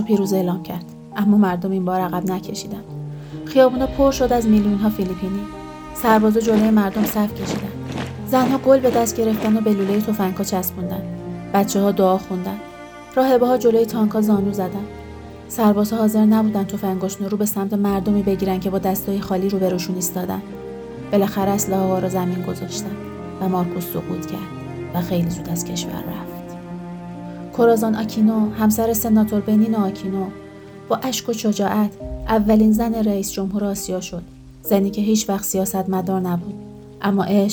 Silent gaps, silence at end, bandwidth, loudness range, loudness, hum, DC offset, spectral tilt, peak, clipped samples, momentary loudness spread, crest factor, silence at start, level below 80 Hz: none; 0 s; over 20 kHz; 4 LU; -20 LUFS; none; under 0.1%; -6 dB/octave; -2 dBFS; under 0.1%; 16 LU; 18 dB; 0 s; -44 dBFS